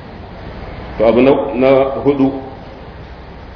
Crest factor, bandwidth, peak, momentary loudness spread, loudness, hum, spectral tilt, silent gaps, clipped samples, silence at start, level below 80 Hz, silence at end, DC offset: 16 dB; 5.4 kHz; 0 dBFS; 22 LU; -13 LUFS; none; -9 dB/octave; none; under 0.1%; 0 s; -36 dBFS; 0 s; under 0.1%